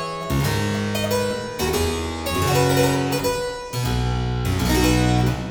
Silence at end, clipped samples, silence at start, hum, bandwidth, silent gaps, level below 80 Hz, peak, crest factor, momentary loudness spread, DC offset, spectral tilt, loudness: 0 s; under 0.1%; 0 s; none; over 20 kHz; none; -32 dBFS; -6 dBFS; 16 dB; 7 LU; under 0.1%; -5 dB/octave; -21 LUFS